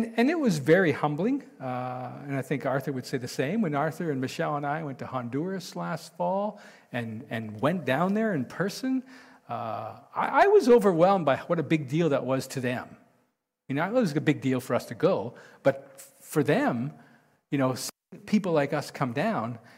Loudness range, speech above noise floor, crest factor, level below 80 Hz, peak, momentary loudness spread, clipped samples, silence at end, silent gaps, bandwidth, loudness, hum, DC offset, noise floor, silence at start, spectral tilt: 7 LU; 47 dB; 18 dB; -70 dBFS; -10 dBFS; 13 LU; under 0.1%; 0.2 s; none; 16 kHz; -27 LUFS; none; under 0.1%; -74 dBFS; 0 s; -6.5 dB/octave